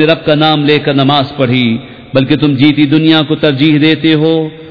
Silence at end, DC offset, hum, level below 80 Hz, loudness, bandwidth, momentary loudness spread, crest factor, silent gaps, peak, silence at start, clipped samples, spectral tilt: 0 s; 0.5%; none; -44 dBFS; -10 LUFS; 5.4 kHz; 5 LU; 10 dB; none; 0 dBFS; 0 s; 0.8%; -8.5 dB/octave